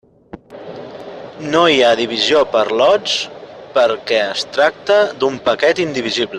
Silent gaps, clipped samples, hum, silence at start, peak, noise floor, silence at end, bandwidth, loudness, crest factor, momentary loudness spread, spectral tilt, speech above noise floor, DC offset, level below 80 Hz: none; under 0.1%; none; 0.35 s; 0 dBFS; -38 dBFS; 0 s; 10 kHz; -15 LUFS; 16 dB; 19 LU; -3.5 dB/octave; 24 dB; under 0.1%; -56 dBFS